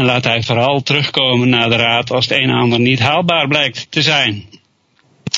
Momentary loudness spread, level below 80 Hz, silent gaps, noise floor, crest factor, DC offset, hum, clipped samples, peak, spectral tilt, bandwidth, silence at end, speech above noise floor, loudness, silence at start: 3 LU; -52 dBFS; none; -57 dBFS; 14 dB; under 0.1%; none; under 0.1%; 0 dBFS; -5 dB/octave; 7.8 kHz; 0 s; 43 dB; -13 LUFS; 0 s